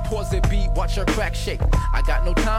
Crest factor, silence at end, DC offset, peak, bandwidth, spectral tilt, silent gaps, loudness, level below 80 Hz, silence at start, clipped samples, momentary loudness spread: 12 dB; 0 s; under 0.1%; -8 dBFS; 14 kHz; -5.5 dB/octave; none; -23 LUFS; -20 dBFS; 0 s; under 0.1%; 3 LU